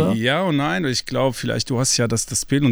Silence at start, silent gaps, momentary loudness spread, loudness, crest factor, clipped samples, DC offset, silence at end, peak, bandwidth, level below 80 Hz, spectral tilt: 0 s; none; 4 LU; -20 LUFS; 14 dB; under 0.1%; under 0.1%; 0 s; -6 dBFS; over 20 kHz; -46 dBFS; -4 dB/octave